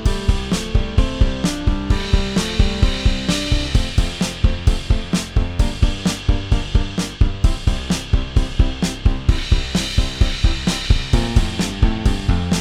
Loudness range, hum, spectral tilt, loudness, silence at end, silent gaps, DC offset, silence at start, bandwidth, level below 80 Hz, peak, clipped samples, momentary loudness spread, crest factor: 1 LU; none; -5 dB/octave; -20 LUFS; 0 s; none; under 0.1%; 0 s; 13.5 kHz; -18 dBFS; -2 dBFS; under 0.1%; 3 LU; 16 dB